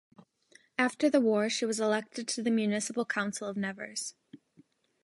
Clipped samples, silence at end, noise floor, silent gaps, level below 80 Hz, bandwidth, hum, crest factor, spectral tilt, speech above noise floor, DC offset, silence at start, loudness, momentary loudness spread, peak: under 0.1%; 0.7 s; -64 dBFS; none; -82 dBFS; 11.5 kHz; none; 20 dB; -3.5 dB/octave; 34 dB; under 0.1%; 0.8 s; -31 LUFS; 11 LU; -12 dBFS